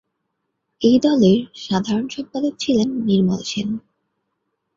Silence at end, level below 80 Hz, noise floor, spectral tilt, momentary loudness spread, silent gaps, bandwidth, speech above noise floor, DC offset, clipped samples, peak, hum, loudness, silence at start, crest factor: 0.95 s; -56 dBFS; -75 dBFS; -6.5 dB/octave; 10 LU; none; 7.6 kHz; 57 dB; under 0.1%; under 0.1%; -4 dBFS; none; -19 LUFS; 0.8 s; 16 dB